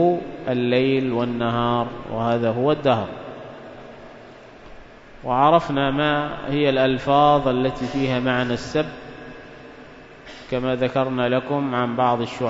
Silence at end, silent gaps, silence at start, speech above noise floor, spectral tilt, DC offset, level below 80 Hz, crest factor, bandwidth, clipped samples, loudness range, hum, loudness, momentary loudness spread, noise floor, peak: 0 s; none; 0 s; 22 dB; -7 dB/octave; under 0.1%; -48 dBFS; 20 dB; 7.8 kHz; under 0.1%; 6 LU; none; -21 LUFS; 23 LU; -43 dBFS; -2 dBFS